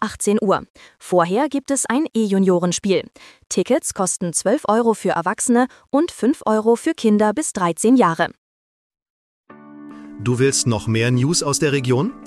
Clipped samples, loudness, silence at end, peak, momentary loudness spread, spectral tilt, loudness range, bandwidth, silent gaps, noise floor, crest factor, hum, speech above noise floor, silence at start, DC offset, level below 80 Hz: under 0.1%; -19 LUFS; 0 s; -2 dBFS; 6 LU; -5 dB/octave; 3 LU; 14.5 kHz; 0.70-0.74 s, 8.38-8.90 s, 9.02-9.44 s; -39 dBFS; 16 dB; none; 21 dB; 0 s; under 0.1%; -54 dBFS